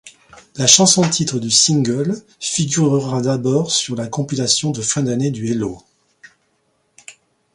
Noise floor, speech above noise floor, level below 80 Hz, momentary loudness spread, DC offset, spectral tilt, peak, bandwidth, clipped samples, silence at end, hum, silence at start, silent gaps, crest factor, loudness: -64 dBFS; 47 dB; -56 dBFS; 12 LU; under 0.1%; -3.5 dB/octave; 0 dBFS; 16 kHz; under 0.1%; 0.45 s; none; 0.05 s; none; 18 dB; -16 LUFS